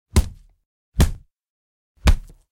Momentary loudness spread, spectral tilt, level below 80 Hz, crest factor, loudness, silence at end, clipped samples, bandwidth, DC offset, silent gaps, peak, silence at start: 14 LU; -5.5 dB/octave; -24 dBFS; 16 dB; -23 LUFS; 0.3 s; under 0.1%; 16.5 kHz; under 0.1%; 0.66-0.92 s, 1.49-1.95 s; -6 dBFS; 0.15 s